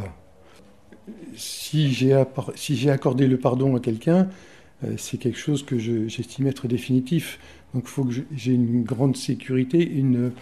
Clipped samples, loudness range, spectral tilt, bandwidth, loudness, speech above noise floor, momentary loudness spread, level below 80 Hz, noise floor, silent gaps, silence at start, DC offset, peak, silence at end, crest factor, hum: under 0.1%; 4 LU; -6.5 dB/octave; 14.5 kHz; -23 LUFS; 29 dB; 12 LU; -58 dBFS; -52 dBFS; none; 0 s; 0.2%; -4 dBFS; 0 s; 18 dB; none